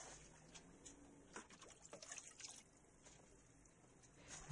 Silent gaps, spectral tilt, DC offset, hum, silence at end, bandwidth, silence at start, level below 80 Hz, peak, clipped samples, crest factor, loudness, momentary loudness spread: none; -2 dB/octave; under 0.1%; none; 0 s; 10.5 kHz; 0 s; -76 dBFS; -38 dBFS; under 0.1%; 24 dB; -60 LUFS; 14 LU